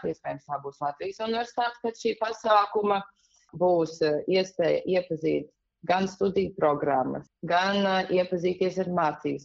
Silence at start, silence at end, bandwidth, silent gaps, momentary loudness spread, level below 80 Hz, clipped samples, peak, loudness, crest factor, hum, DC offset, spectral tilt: 0 s; 0.05 s; 7.8 kHz; none; 10 LU; -64 dBFS; under 0.1%; -10 dBFS; -27 LUFS; 18 dB; none; under 0.1%; -4 dB/octave